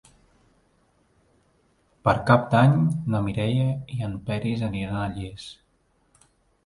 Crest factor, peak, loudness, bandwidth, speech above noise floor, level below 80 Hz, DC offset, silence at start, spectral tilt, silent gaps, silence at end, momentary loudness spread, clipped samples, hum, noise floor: 22 dB; -2 dBFS; -24 LUFS; 11.5 kHz; 43 dB; -50 dBFS; under 0.1%; 2.05 s; -8 dB/octave; none; 1.15 s; 14 LU; under 0.1%; none; -66 dBFS